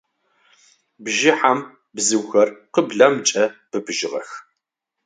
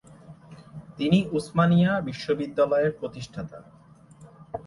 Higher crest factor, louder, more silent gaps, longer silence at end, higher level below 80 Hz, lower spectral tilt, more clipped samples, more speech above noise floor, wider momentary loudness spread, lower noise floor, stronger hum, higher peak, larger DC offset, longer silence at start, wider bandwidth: about the same, 20 dB vs 18 dB; first, -19 LUFS vs -24 LUFS; neither; first, 0.65 s vs 0.05 s; second, -72 dBFS vs -58 dBFS; second, -2.5 dB/octave vs -7.5 dB/octave; neither; first, 61 dB vs 27 dB; second, 16 LU vs 20 LU; first, -80 dBFS vs -51 dBFS; neither; first, 0 dBFS vs -8 dBFS; neither; first, 1 s vs 0.1 s; second, 9.6 kHz vs 11.5 kHz